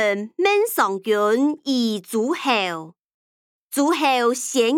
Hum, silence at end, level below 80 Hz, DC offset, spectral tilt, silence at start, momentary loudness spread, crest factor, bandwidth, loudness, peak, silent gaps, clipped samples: none; 0 s; -76 dBFS; under 0.1%; -3 dB/octave; 0 s; 5 LU; 16 dB; 18 kHz; -20 LUFS; -6 dBFS; 3.04-3.69 s; under 0.1%